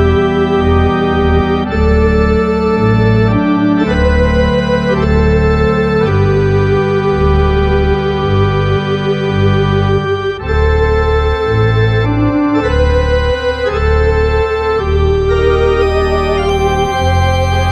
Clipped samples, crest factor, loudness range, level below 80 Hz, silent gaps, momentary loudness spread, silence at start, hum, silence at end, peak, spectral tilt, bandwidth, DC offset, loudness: under 0.1%; 10 dB; 1 LU; -18 dBFS; none; 3 LU; 0 s; none; 0 s; 0 dBFS; -7.5 dB/octave; 9.2 kHz; under 0.1%; -12 LUFS